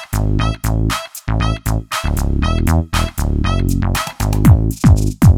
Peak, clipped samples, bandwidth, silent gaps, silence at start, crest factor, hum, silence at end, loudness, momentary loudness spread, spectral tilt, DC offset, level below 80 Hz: 0 dBFS; under 0.1%; 18 kHz; none; 0 s; 14 dB; none; 0 s; -16 LUFS; 8 LU; -6 dB/octave; under 0.1%; -20 dBFS